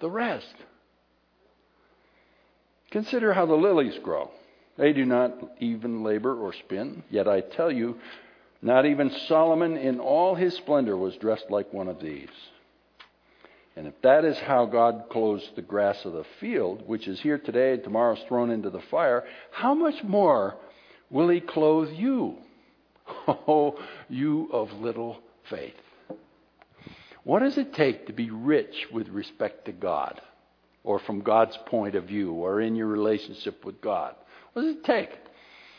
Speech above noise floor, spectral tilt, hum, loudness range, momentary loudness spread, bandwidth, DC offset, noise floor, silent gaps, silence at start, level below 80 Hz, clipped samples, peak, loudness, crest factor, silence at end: 41 dB; -8 dB/octave; none; 5 LU; 15 LU; 5.4 kHz; under 0.1%; -67 dBFS; none; 0 s; -72 dBFS; under 0.1%; -6 dBFS; -26 LUFS; 22 dB; 0.6 s